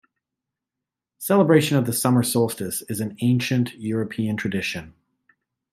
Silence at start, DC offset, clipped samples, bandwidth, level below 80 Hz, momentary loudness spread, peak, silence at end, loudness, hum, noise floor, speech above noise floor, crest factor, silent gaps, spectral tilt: 1.2 s; under 0.1%; under 0.1%; 16 kHz; -62 dBFS; 11 LU; -4 dBFS; 0.85 s; -22 LUFS; none; -86 dBFS; 65 dB; 18 dB; none; -5.5 dB/octave